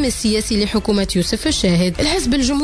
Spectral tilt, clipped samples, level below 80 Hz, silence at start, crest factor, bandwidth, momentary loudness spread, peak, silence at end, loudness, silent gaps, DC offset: -4.5 dB/octave; under 0.1%; -30 dBFS; 0 s; 12 dB; 11 kHz; 2 LU; -4 dBFS; 0 s; -17 LUFS; none; under 0.1%